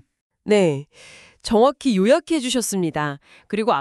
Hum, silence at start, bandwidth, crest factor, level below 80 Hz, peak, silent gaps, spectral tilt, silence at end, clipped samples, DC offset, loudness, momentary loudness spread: none; 0.45 s; 13.5 kHz; 16 dB; -52 dBFS; -4 dBFS; none; -5 dB/octave; 0 s; under 0.1%; under 0.1%; -20 LUFS; 13 LU